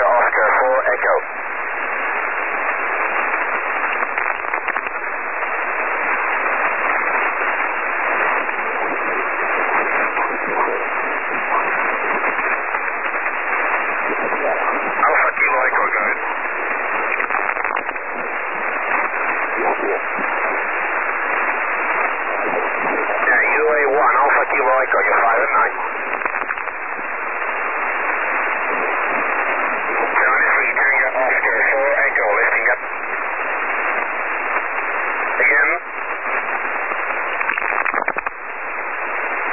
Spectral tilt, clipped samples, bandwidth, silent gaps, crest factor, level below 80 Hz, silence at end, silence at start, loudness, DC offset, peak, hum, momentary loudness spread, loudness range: -8 dB/octave; under 0.1%; 3.1 kHz; none; 14 dB; -58 dBFS; 0 s; 0 s; -18 LUFS; 2%; -4 dBFS; none; 7 LU; 4 LU